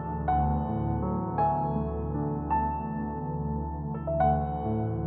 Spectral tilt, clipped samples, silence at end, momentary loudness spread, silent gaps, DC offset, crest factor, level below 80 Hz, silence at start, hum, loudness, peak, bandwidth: -10 dB/octave; under 0.1%; 0 s; 7 LU; none; under 0.1%; 14 dB; -38 dBFS; 0 s; none; -29 LUFS; -14 dBFS; 4 kHz